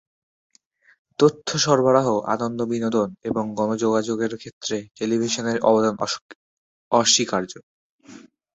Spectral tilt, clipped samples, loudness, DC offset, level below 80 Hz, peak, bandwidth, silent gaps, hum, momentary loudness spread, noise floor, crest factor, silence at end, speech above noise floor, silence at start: -4 dB/octave; under 0.1%; -21 LUFS; under 0.1%; -62 dBFS; -2 dBFS; 8.2 kHz; 4.53-4.61 s, 6.21-6.29 s, 6.35-6.91 s, 7.63-7.99 s; none; 11 LU; -59 dBFS; 20 dB; 0.35 s; 38 dB; 1.2 s